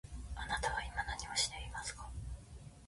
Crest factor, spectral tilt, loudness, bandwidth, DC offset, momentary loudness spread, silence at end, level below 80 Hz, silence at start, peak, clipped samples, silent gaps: 20 dB; -1.5 dB/octave; -40 LUFS; 11.5 kHz; under 0.1%; 14 LU; 0 s; -48 dBFS; 0.05 s; -22 dBFS; under 0.1%; none